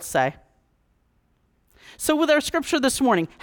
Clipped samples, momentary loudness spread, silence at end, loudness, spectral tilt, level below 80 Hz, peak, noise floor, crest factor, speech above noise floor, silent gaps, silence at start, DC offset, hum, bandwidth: under 0.1%; 6 LU; 0.15 s; -22 LUFS; -3.5 dB/octave; -54 dBFS; -6 dBFS; -66 dBFS; 18 dB; 44 dB; none; 0 s; under 0.1%; none; 19.5 kHz